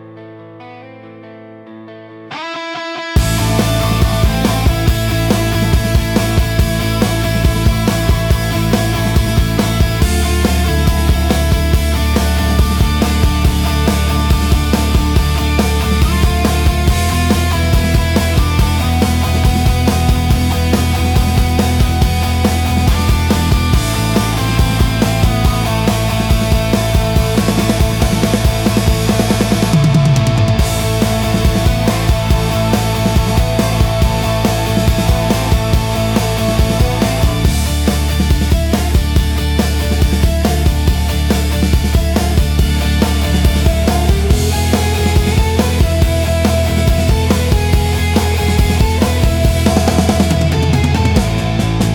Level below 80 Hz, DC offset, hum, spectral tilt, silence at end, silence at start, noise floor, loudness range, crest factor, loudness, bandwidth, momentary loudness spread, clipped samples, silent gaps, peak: -18 dBFS; under 0.1%; none; -5.5 dB/octave; 0 s; 0 s; -34 dBFS; 1 LU; 12 dB; -14 LUFS; 19 kHz; 2 LU; under 0.1%; none; -2 dBFS